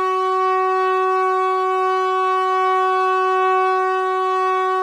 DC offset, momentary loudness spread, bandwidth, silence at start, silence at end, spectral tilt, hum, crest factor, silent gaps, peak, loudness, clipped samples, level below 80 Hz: under 0.1%; 2 LU; 10.5 kHz; 0 s; 0 s; -2.5 dB/octave; none; 10 dB; none; -8 dBFS; -18 LUFS; under 0.1%; -68 dBFS